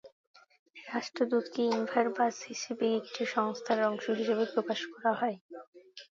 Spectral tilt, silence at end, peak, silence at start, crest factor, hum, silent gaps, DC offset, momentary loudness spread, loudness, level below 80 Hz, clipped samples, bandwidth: -4 dB/octave; 0.1 s; -14 dBFS; 0.05 s; 18 dB; none; 0.12-0.34 s, 0.59-0.66 s, 5.41-5.49 s, 5.67-5.72 s; under 0.1%; 15 LU; -32 LUFS; -84 dBFS; under 0.1%; 7.6 kHz